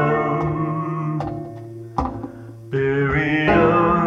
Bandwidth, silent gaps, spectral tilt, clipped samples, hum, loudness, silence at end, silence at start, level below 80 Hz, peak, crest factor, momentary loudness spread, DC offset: 7.2 kHz; none; -8.5 dB/octave; under 0.1%; none; -20 LUFS; 0 s; 0 s; -40 dBFS; -4 dBFS; 16 dB; 18 LU; under 0.1%